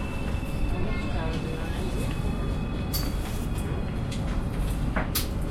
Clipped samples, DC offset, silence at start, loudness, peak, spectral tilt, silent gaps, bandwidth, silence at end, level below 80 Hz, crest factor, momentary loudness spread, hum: under 0.1%; under 0.1%; 0 s; -30 LUFS; -12 dBFS; -5.5 dB/octave; none; 16.5 kHz; 0 s; -32 dBFS; 16 dB; 3 LU; none